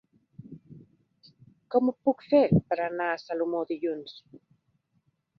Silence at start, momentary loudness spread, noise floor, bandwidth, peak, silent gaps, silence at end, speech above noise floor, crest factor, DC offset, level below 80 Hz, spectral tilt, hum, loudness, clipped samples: 0.45 s; 25 LU; -73 dBFS; 6.2 kHz; -10 dBFS; none; 1 s; 46 dB; 20 dB; under 0.1%; -58 dBFS; -9 dB/octave; none; -27 LUFS; under 0.1%